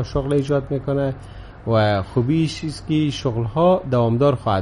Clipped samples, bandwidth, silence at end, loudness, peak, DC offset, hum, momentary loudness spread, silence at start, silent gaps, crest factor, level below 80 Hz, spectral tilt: under 0.1%; 11.5 kHz; 0 s; -20 LUFS; -6 dBFS; under 0.1%; none; 8 LU; 0 s; none; 14 dB; -40 dBFS; -7.5 dB/octave